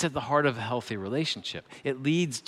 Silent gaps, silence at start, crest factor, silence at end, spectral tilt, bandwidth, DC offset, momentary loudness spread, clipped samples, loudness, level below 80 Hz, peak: none; 0 s; 18 dB; 0.1 s; -5 dB/octave; 14 kHz; under 0.1%; 9 LU; under 0.1%; -29 LUFS; -66 dBFS; -10 dBFS